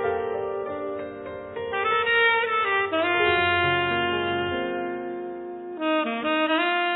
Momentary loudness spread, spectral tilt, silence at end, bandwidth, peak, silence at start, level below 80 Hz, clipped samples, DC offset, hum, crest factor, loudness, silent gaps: 14 LU; -8 dB/octave; 0 s; 4.1 kHz; -8 dBFS; 0 s; -60 dBFS; under 0.1%; under 0.1%; none; 16 dB; -24 LUFS; none